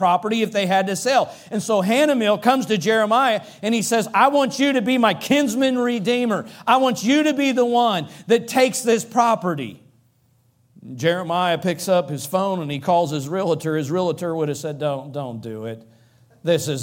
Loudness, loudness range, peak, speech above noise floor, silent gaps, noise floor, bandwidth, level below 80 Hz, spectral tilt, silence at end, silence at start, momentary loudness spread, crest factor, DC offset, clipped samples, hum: -20 LUFS; 5 LU; -2 dBFS; 41 dB; none; -61 dBFS; 17 kHz; -68 dBFS; -4.5 dB/octave; 0 s; 0 s; 9 LU; 18 dB; under 0.1%; under 0.1%; none